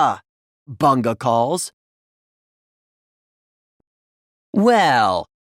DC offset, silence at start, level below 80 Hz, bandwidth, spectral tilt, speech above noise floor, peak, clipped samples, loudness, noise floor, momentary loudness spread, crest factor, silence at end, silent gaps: under 0.1%; 0 s; -62 dBFS; 16.5 kHz; -5 dB/octave; over 73 dB; -4 dBFS; under 0.1%; -18 LUFS; under -90 dBFS; 11 LU; 18 dB; 0.25 s; 0.29-0.66 s, 1.73-3.80 s, 3.87-4.53 s